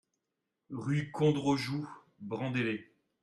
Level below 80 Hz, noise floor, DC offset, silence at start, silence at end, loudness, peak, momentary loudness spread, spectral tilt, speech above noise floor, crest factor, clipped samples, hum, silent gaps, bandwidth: -70 dBFS; -86 dBFS; under 0.1%; 0.7 s; 0.4 s; -33 LUFS; -16 dBFS; 15 LU; -6.5 dB/octave; 54 dB; 20 dB; under 0.1%; none; none; 12.5 kHz